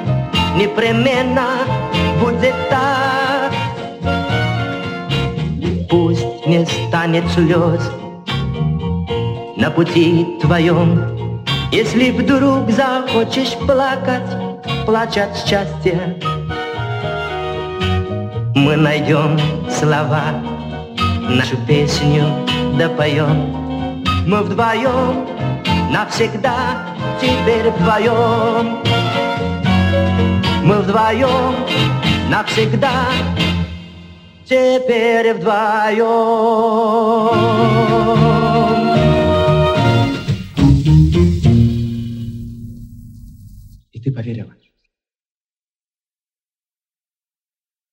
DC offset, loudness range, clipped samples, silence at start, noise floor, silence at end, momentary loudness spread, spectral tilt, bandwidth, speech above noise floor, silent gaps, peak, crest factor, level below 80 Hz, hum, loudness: under 0.1%; 6 LU; under 0.1%; 0 s; under -90 dBFS; 3.45 s; 9 LU; -6.5 dB/octave; 14 kHz; over 76 dB; none; 0 dBFS; 16 dB; -34 dBFS; none; -15 LUFS